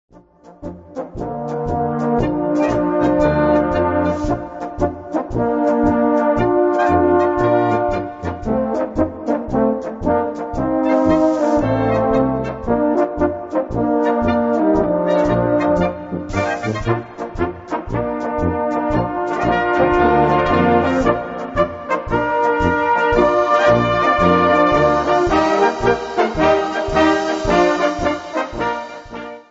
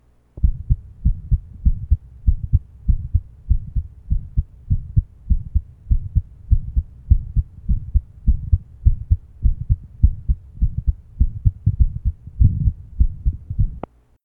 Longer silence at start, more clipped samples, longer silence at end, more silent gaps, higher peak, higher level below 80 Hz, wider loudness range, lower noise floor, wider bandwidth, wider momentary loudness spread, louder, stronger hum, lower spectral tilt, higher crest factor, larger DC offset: about the same, 0.45 s vs 0.35 s; neither; second, 0.1 s vs 0.45 s; neither; about the same, 0 dBFS vs 0 dBFS; second, -36 dBFS vs -20 dBFS; first, 5 LU vs 2 LU; first, -45 dBFS vs -37 dBFS; first, 8 kHz vs 1.4 kHz; about the same, 9 LU vs 7 LU; first, -17 LUFS vs -23 LUFS; neither; second, -7 dB/octave vs -13 dB/octave; about the same, 16 dB vs 20 dB; neither